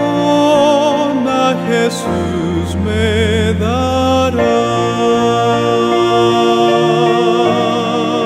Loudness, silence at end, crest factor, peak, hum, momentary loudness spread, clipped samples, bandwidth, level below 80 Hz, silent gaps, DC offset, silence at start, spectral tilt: -13 LUFS; 0 s; 12 dB; 0 dBFS; none; 5 LU; under 0.1%; 15 kHz; -36 dBFS; none; under 0.1%; 0 s; -5.5 dB/octave